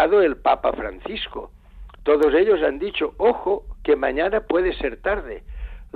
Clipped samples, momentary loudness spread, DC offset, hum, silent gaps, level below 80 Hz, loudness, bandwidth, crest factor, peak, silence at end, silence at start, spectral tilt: under 0.1%; 14 LU; under 0.1%; none; none; -40 dBFS; -21 LUFS; 4.7 kHz; 16 dB; -6 dBFS; 0.1 s; 0 s; -7 dB/octave